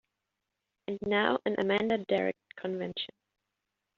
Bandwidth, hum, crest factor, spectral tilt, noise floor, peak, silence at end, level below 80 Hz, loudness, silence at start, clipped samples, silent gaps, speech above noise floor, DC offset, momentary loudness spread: 7.2 kHz; none; 22 dB; -3 dB/octave; -86 dBFS; -10 dBFS; 0.9 s; -70 dBFS; -31 LUFS; 0.9 s; under 0.1%; none; 55 dB; under 0.1%; 12 LU